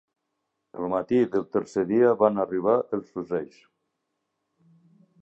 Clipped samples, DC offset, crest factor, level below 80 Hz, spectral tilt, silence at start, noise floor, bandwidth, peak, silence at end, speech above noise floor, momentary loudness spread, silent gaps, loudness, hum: under 0.1%; under 0.1%; 22 dB; -66 dBFS; -8 dB/octave; 0.75 s; -80 dBFS; 8 kHz; -6 dBFS; 1.75 s; 55 dB; 11 LU; none; -25 LUFS; none